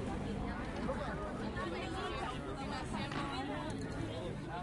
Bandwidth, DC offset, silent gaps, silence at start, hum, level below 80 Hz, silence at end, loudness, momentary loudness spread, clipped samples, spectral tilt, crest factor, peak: 11.5 kHz; under 0.1%; none; 0 s; none; -50 dBFS; 0 s; -41 LUFS; 2 LU; under 0.1%; -6 dB/octave; 16 dB; -24 dBFS